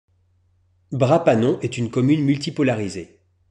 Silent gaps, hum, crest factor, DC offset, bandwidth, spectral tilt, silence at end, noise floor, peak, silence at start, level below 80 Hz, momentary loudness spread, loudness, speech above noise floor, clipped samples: none; none; 18 dB; under 0.1%; 10.5 kHz; -7 dB/octave; 0.45 s; -62 dBFS; -2 dBFS; 0.9 s; -60 dBFS; 12 LU; -20 LUFS; 42 dB; under 0.1%